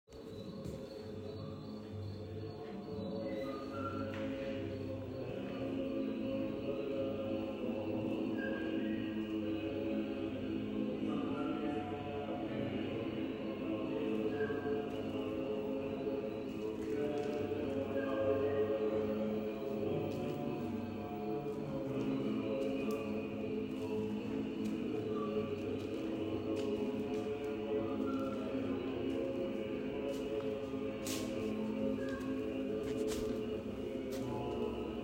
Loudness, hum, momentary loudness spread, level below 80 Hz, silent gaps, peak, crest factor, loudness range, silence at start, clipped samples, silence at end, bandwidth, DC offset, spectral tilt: -39 LUFS; none; 5 LU; -62 dBFS; none; -22 dBFS; 16 dB; 4 LU; 0.1 s; under 0.1%; 0 s; 16 kHz; under 0.1%; -6.5 dB/octave